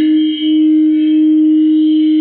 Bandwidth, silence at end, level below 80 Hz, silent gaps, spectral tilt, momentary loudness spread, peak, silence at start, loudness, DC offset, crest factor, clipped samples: 4 kHz; 0 s; -64 dBFS; none; -8 dB/octave; 2 LU; -6 dBFS; 0 s; -11 LUFS; under 0.1%; 4 dB; under 0.1%